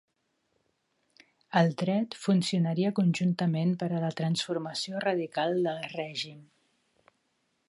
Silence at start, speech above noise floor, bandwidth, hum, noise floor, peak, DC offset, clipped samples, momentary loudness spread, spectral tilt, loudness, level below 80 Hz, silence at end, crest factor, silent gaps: 1.5 s; 48 dB; 11.5 kHz; none; -76 dBFS; -10 dBFS; under 0.1%; under 0.1%; 8 LU; -6 dB/octave; -29 LUFS; -78 dBFS; 1.25 s; 20 dB; none